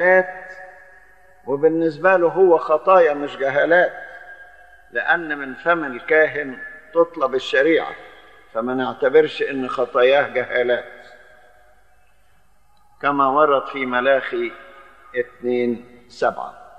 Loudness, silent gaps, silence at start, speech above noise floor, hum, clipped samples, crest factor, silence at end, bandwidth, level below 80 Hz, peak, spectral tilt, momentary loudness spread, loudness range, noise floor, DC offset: -19 LUFS; none; 0 s; 41 dB; none; under 0.1%; 18 dB; 0.15 s; 8.4 kHz; -62 dBFS; -2 dBFS; -6 dB/octave; 16 LU; 5 LU; -59 dBFS; 0.3%